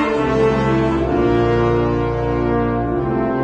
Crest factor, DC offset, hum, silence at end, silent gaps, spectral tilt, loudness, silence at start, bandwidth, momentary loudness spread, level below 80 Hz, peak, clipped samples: 14 dB; under 0.1%; none; 0 s; none; -8.5 dB/octave; -17 LUFS; 0 s; 8.6 kHz; 4 LU; -30 dBFS; -4 dBFS; under 0.1%